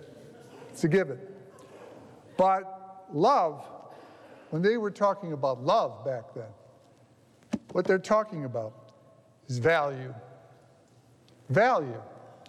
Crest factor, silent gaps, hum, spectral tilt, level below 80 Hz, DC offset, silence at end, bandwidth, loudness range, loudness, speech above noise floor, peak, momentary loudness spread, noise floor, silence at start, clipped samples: 16 dB; none; none; -6.5 dB/octave; -70 dBFS; under 0.1%; 0.2 s; 12.5 kHz; 4 LU; -28 LUFS; 33 dB; -14 dBFS; 24 LU; -60 dBFS; 0 s; under 0.1%